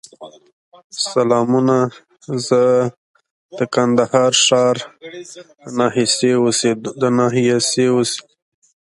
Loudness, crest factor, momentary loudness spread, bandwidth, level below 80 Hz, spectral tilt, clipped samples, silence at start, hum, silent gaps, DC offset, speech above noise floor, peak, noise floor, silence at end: -16 LUFS; 16 dB; 14 LU; 11.5 kHz; -62 dBFS; -4 dB/octave; under 0.1%; 0.2 s; none; 0.53-0.72 s, 0.84-0.90 s, 2.97-3.14 s, 3.31-3.49 s; under 0.1%; 23 dB; 0 dBFS; -39 dBFS; 0.8 s